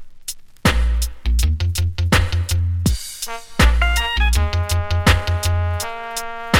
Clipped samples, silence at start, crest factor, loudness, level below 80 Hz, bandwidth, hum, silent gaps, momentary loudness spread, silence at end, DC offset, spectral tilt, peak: under 0.1%; 0 s; 16 dB; -19 LUFS; -22 dBFS; 17 kHz; none; none; 10 LU; 0 s; under 0.1%; -4.5 dB/octave; -2 dBFS